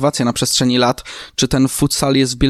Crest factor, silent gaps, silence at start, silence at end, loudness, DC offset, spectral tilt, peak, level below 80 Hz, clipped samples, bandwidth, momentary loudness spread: 14 dB; none; 0 s; 0 s; -15 LUFS; under 0.1%; -4 dB/octave; -2 dBFS; -34 dBFS; under 0.1%; 14.5 kHz; 6 LU